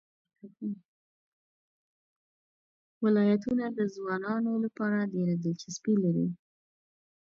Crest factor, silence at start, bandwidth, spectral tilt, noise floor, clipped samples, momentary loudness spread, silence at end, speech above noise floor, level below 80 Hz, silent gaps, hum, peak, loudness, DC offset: 16 dB; 0.45 s; 7.6 kHz; -7 dB/octave; under -90 dBFS; under 0.1%; 13 LU; 0.85 s; over 61 dB; -74 dBFS; 0.85-3.01 s; none; -16 dBFS; -30 LUFS; under 0.1%